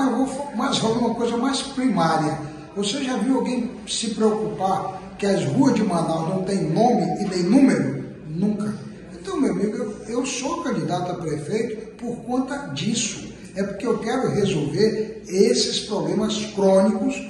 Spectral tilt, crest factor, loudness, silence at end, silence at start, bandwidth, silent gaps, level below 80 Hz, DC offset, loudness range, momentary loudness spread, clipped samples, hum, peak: -5 dB/octave; 18 dB; -22 LUFS; 0 s; 0 s; 11.5 kHz; none; -54 dBFS; under 0.1%; 5 LU; 11 LU; under 0.1%; none; -4 dBFS